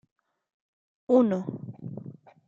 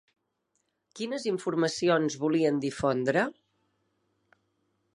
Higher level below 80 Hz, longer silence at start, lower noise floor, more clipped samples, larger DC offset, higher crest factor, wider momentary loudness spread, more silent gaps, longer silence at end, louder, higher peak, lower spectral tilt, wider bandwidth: second, -76 dBFS vs -66 dBFS; first, 1.1 s vs 0.95 s; second, -44 dBFS vs -78 dBFS; neither; neither; about the same, 20 dB vs 20 dB; first, 20 LU vs 7 LU; neither; second, 0.35 s vs 1.65 s; first, -25 LUFS vs -28 LUFS; about the same, -10 dBFS vs -10 dBFS; first, -9.5 dB/octave vs -5 dB/octave; second, 7.2 kHz vs 11.5 kHz